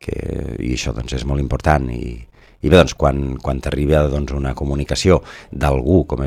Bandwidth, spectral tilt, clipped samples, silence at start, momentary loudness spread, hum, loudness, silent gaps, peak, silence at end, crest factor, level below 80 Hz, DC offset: 14.5 kHz; -6 dB/octave; under 0.1%; 0.05 s; 12 LU; none; -18 LUFS; none; 0 dBFS; 0 s; 18 dB; -26 dBFS; under 0.1%